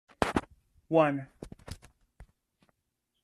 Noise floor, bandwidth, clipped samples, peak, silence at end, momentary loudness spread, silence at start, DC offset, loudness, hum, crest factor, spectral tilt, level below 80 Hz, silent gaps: -82 dBFS; 13.5 kHz; under 0.1%; -6 dBFS; 1 s; 22 LU; 0.2 s; under 0.1%; -29 LUFS; none; 28 dB; -6 dB/octave; -54 dBFS; none